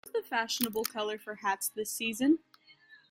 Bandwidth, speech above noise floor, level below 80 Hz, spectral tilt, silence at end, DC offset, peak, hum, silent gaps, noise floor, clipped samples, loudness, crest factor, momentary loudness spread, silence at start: 16.5 kHz; 27 dB; -76 dBFS; -2 dB/octave; 0.15 s; under 0.1%; -10 dBFS; none; none; -60 dBFS; under 0.1%; -32 LUFS; 24 dB; 6 LU; 0.05 s